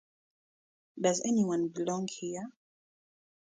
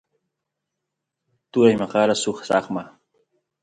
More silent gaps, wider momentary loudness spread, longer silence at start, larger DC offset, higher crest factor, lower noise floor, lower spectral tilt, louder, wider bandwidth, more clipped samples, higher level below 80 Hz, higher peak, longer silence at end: neither; about the same, 11 LU vs 12 LU; second, 0.95 s vs 1.55 s; neither; about the same, 20 dB vs 22 dB; first, under -90 dBFS vs -82 dBFS; about the same, -5 dB/octave vs -5 dB/octave; second, -32 LUFS vs -21 LUFS; about the same, 9.6 kHz vs 10.5 kHz; neither; second, -78 dBFS vs -64 dBFS; second, -14 dBFS vs -2 dBFS; first, 0.95 s vs 0.75 s